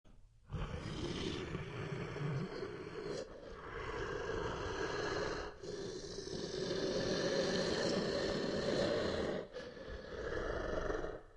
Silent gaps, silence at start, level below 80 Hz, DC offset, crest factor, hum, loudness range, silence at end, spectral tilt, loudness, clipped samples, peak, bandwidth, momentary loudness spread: none; 0.05 s; -54 dBFS; under 0.1%; 18 dB; none; 6 LU; 0 s; -5 dB/octave; -40 LUFS; under 0.1%; -22 dBFS; 11.5 kHz; 10 LU